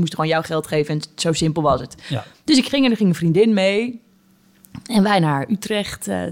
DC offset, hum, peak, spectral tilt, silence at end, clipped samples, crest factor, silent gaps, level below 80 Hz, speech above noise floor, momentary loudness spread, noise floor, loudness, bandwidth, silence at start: under 0.1%; none; -4 dBFS; -5.5 dB/octave; 0 s; under 0.1%; 16 dB; none; -50 dBFS; 36 dB; 12 LU; -55 dBFS; -19 LUFS; 17 kHz; 0 s